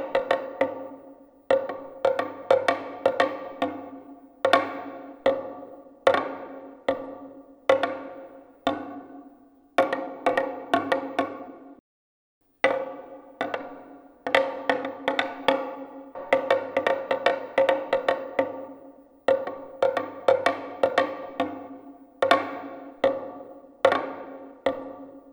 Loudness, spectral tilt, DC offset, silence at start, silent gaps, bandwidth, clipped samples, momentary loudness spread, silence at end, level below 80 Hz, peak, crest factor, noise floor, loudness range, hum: -26 LUFS; -4 dB/octave; under 0.1%; 0 s; 11.80-12.41 s; over 20 kHz; under 0.1%; 18 LU; 0 s; -70 dBFS; -2 dBFS; 24 dB; -55 dBFS; 4 LU; none